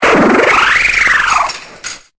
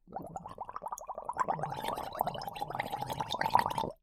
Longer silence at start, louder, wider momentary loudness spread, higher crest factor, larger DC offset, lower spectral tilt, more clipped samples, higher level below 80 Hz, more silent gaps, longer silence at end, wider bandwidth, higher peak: about the same, 0 s vs 0.05 s; first, -9 LUFS vs -36 LUFS; about the same, 16 LU vs 14 LU; second, 12 dB vs 26 dB; neither; about the same, -3 dB/octave vs -4 dB/octave; neither; first, -38 dBFS vs -60 dBFS; neither; about the same, 0.2 s vs 0.1 s; second, 8 kHz vs 17.5 kHz; first, 0 dBFS vs -10 dBFS